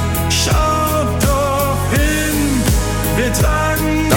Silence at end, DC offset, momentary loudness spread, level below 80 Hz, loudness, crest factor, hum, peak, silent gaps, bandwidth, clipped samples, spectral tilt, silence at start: 0 s; under 0.1%; 2 LU; -22 dBFS; -15 LUFS; 14 dB; none; 0 dBFS; none; 18 kHz; under 0.1%; -4.5 dB/octave; 0 s